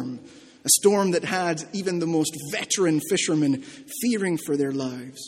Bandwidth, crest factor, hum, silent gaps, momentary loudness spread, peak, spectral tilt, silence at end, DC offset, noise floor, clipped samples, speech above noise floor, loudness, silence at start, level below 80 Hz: 16.5 kHz; 20 dB; none; none; 11 LU; -4 dBFS; -3.5 dB/octave; 0 s; under 0.1%; -45 dBFS; under 0.1%; 22 dB; -23 LUFS; 0 s; -68 dBFS